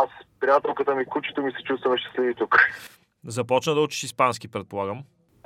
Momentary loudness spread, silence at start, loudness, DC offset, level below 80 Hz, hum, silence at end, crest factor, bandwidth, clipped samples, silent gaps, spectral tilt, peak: 13 LU; 0 s; -24 LUFS; under 0.1%; -70 dBFS; none; 0.4 s; 22 dB; 16 kHz; under 0.1%; none; -4 dB/octave; -2 dBFS